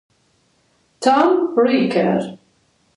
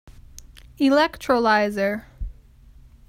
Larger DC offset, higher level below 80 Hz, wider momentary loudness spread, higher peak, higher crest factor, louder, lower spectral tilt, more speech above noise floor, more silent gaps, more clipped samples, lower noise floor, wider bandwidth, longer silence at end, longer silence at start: neither; second, -66 dBFS vs -42 dBFS; second, 7 LU vs 20 LU; first, -2 dBFS vs -6 dBFS; about the same, 18 dB vs 18 dB; first, -17 LUFS vs -21 LUFS; about the same, -6 dB/octave vs -5 dB/octave; first, 45 dB vs 29 dB; neither; neither; first, -61 dBFS vs -49 dBFS; second, 11.5 kHz vs 16 kHz; second, 0.6 s vs 0.75 s; first, 1 s vs 0.1 s